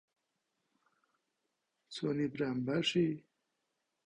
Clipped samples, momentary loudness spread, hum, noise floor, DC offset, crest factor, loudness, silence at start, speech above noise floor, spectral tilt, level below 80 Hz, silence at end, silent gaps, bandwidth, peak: under 0.1%; 12 LU; none; -85 dBFS; under 0.1%; 18 dB; -35 LUFS; 1.9 s; 51 dB; -5.5 dB/octave; -74 dBFS; 0.85 s; none; 10 kHz; -20 dBFS